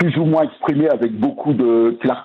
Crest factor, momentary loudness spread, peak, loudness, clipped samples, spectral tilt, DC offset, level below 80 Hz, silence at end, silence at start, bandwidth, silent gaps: 10 dB; 4 LU; -6 dBFS; -17 LUFS; under 0.1%; -10 dB/octave; under 0.1%; -60 dBFS; 0 s; 0 s; 4.3 kHz; none